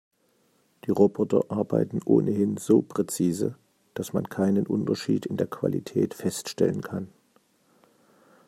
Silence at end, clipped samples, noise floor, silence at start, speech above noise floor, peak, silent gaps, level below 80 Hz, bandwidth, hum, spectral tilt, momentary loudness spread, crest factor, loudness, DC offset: 1.4 s; under 0.1%; -67 dBFS; 0.85 s; 42 dB; -6 dBFS; none; -68 dBFS; 15 kHz; none; -6.5 dB/octave; 10 LU; 20 dB; -26 LUFS; under 0.1%